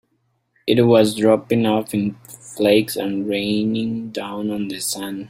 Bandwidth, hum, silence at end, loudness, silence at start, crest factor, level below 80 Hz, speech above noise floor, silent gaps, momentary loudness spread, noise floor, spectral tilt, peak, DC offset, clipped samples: 16 kHz; none; 0 s; -19 LUFS; 0.65 s; 18 dB; -58 dBFS; 49 dB; none; 12 LU; -68 dBFS; -5 dB/octave; -2 dBFS; under 0.1%; under 0.1%